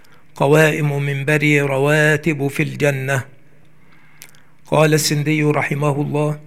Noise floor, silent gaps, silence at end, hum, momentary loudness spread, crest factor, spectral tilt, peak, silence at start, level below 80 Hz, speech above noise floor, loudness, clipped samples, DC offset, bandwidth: -52 dBFS; none; 0.05 s; none; 7 LU; 16 dB; -5.5 dB/octave; 0 dBFS; 0.35 s; -58 dBFS; 36 dB; -17 LUFS; under 0.1%; 0.8%; 16 kHz